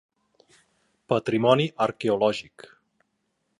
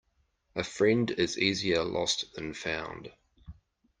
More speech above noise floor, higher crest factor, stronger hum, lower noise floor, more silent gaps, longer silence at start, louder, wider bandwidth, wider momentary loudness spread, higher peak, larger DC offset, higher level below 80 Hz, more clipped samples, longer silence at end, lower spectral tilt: first, 52 dB vs 43 dB; about the same, 22 dB vs 22 dB; neither; about the same, -75 dBFS vs -73 dBFS; neither; first, 1.1 s vs 0.55 s; first, -24 LUFS vs -30 LUFS; about the same, 11 kHz vs 10.5 kHz; second, 6 LU vs 14 LU; first, -6 dBFS vs -10 dBFS; neither; second, -68 dBFS vs -60 dBFS; neither; first, 1.2 s vs 0.5 s; first, -6.5 dB/octave vs -4 dB/octave